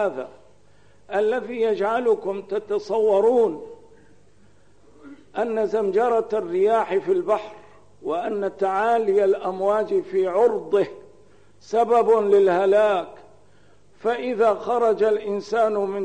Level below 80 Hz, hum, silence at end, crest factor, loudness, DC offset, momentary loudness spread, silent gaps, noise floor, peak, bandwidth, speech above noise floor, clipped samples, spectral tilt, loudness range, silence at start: -66 dBFS; 50 Hz at -65 dBFS; 0 s; 14 dB; -21 LUFS; 0.3%; 10 LU; none; -57 dBFS; -8 dBFS; 9.2 kHz; 36 dB; under 0.1%; -6 dB/octave; 4 LU; 0 s